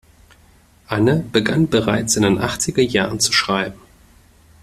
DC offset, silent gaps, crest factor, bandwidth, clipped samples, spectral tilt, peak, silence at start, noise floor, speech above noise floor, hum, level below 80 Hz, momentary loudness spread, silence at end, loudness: under 0.1%; none; 20 dB; 14.5 kHz; under 0.1%; -4 dB/octave; 0 dBFS; 0.9 s; -51 dBFS; 34 dB; none; -46 dBFS; 5 LU; 0.85 s; -17 LUFS